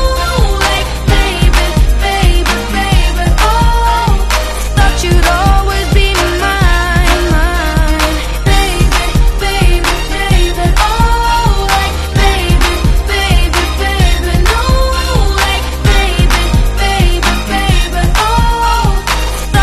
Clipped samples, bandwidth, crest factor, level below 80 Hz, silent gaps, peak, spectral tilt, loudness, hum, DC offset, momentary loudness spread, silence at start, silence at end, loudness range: 0.3%; 14 kHz; 10 dB; -12 dBFS; none; 0 dBFS; -4.5 dB/octave; -12 LUFS; none; under 0.1%; 3 LU; 0 s; 0 s; 1 LU